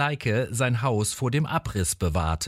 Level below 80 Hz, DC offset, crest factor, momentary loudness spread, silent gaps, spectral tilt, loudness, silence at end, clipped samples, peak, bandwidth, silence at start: -40 dBFS; under 0.1%; 16 dB; 2 LU; none; -5 dB/octave; -25 LUFS; 0 s; under 0.1%; -10 dBFS; 16 kHz; 0 s